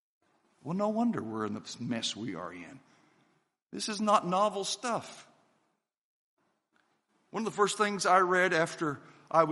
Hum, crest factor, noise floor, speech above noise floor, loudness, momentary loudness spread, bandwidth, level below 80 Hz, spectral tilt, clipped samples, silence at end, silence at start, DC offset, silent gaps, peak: none; 24 dB; -78 dBFS; 48 dB; -30 LUFS; 18 LU; 11.5 kHz; -80 dBFS; -4 dB/octave; under 0.1%; 0 s; 0.65 s; under 0.1%; 3.62-3.66 s, 5.98-6.37 s; -10 dBFS